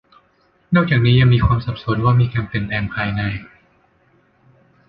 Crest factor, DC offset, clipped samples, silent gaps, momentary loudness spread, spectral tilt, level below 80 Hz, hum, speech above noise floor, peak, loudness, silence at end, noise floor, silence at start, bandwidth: 16 dB; under 0.1%; under 0.1%; none; 10 LU; -10 dB/octave; -36 dBFS; none; 43 dB; -2 dBFS; -17 LUFS; 1.45 s; -59 dBFS; 0.7 s; 5.2 kHz